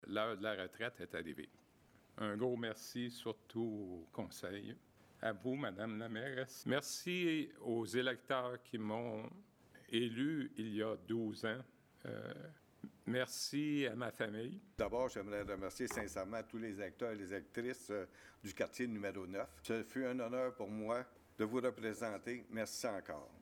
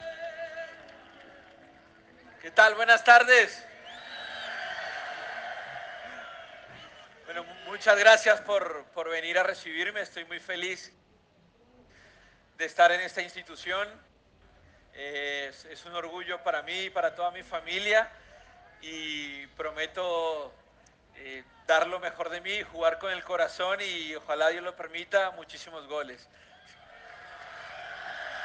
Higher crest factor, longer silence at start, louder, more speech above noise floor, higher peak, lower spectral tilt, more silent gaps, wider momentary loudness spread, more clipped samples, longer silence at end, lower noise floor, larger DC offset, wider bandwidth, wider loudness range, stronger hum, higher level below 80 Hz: second, 20 dB vs 26 dB; about the same, 0 s vs 0 s; second, -43 LUFS vs -27 LUFS; second, 26 dB vs 36 dB; second, -22 dBFS vs -4 dBFS; first, -4.5 dB/octave vs -1 dB/octave; neither; second, 11 LU vs 23 LU; neither; about the same, 0 s vs 0 s; first, -69 dBFS vs -63 dBFS; neither; first, 18 kHz vs 9.8 kHz; second, 4 LU vs 13 LU; neither; about the same, -72 dBFS vs -68 dBFS